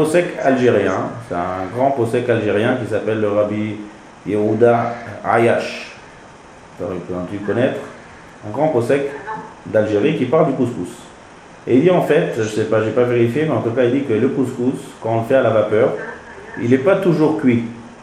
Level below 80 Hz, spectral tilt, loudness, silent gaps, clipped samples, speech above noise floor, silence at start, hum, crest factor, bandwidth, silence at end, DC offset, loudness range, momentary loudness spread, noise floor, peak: -54 dBFS; -7 dB/octave; -17 LUFS; none; under 0.1%; 24 dB; 0 s; none; 18 dB; 14.5 kHz; 0 s; under 0.1%; 4 LU; 15 LU; -40 dBFS; 0 dBFS